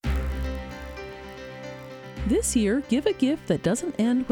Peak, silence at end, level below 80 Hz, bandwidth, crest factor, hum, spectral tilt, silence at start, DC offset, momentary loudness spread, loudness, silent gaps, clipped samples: -10 dBFS; 0 s; -36 dBFS; 19 kHz; 16 dB; none; -5 dB/octave; 0.05 s; under 0.1%; 16 LU; -25 LUFS; none; under 0.1%